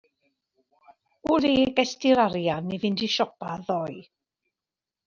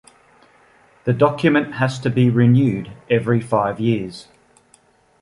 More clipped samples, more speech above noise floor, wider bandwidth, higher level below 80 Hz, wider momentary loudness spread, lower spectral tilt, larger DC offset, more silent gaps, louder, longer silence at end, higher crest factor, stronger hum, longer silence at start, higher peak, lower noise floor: neither; first, 66 dB vs 38 dB; second, 7.2 kHz vs 11 kHz; second, -60 dBFS vs -54 dBFS; about the same, 13 LU vs 11 LU; second, -5 dB/octave vs -8 dB/octave; neither; neither; second, -25 LUFS vs -18 LUFS; about the same, 1.05 s vs 1 s; about the same, 20 dB vs 16 dB; neither; first, 1.25 s vs 1.05 s; second, -6 dBFS vs -2 dBFS; first, -90 dBFS vs -56 dBFS